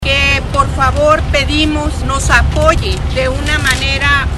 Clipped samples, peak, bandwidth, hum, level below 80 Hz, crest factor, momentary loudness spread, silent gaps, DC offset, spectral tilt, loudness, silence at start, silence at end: 0.2%; 0 dBFS; 12.5 kHz; none; -18 dBFS; 12 dB; 5 LU; none; under 0.1%; -4.5 dB/octave; -12 LUFS; 0 s; 0 s